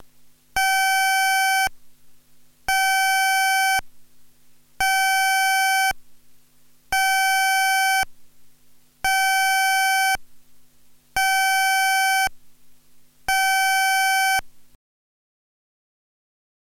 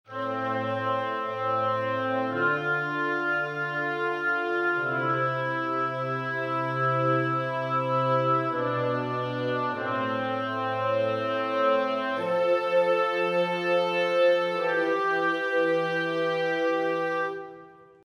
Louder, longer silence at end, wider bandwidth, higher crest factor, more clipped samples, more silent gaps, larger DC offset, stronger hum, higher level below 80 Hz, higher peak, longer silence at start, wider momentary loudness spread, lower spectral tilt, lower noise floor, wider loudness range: first, -19 LUFS vs -26 LUFS; first, 2.1 s vs 0.35 s; first, 16.5 kHz vs 10 kHz; about the same, 12 dB vs 14 dB; neither; neither; neither; first, 50 Hz at -70 dBFS vs none; first, -50 dBFS vs -76 dBFS; about the same, -10 dBFS vs -12 dBFS; about the same, 0 s vs 0.1 s; about the same, 7 LU vs 5 LU; second, 2.5 dB/octave vs -6.5 dB/octave; about the same, -52 dBFS vs -49 dBFS; about the same, 3 LU vs 3 LU